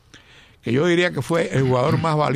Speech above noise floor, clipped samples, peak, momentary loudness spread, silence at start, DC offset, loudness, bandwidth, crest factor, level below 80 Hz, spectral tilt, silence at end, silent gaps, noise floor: 30 dB; under 0.1%; -6 dBFS; 5 LU; 0.15 s; under 0.1%; -20 LUFS; 14 kHz; 14 dB; -52 dBFS; -6.5 dB/octave; 0 s; none; -49 dBFS